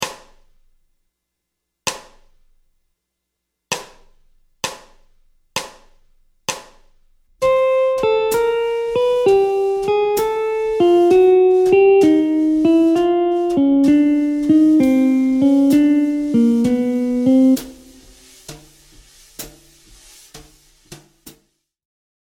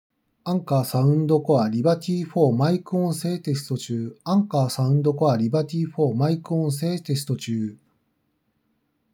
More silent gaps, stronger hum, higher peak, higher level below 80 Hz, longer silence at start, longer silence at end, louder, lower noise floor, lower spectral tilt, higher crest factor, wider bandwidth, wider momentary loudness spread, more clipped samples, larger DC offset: neither; neither; about the same, -2 dBFS vs -4 dBFS; first, -50 dBFS vs -78 dBFS; second, 0 s vs 0.45 s; second, 0.9 s vs 1.4 s; first, -16 LUFS vs -23 LUFS; first, -78 dBFS vs -71 dBFS; second, -5 dB/octave vs -7.5 dB/octave; about the same, 16 dB vs 18 dB; second, 17 kHz vs 19.5 kHz; first, 15 LU vs 8 LU; neither; neither